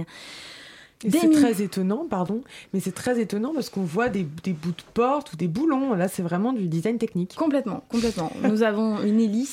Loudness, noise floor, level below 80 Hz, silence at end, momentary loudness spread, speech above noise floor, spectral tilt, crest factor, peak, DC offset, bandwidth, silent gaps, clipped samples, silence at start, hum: -24 LUFS; -46 dBFS; -58 dBFS; 0 s; 9 LU; 22 dB; -6 dB/octave; 16 dB; -8 dBFS; under 0.1%; 16.5 kHz; none; under 0.1%; 0 s; none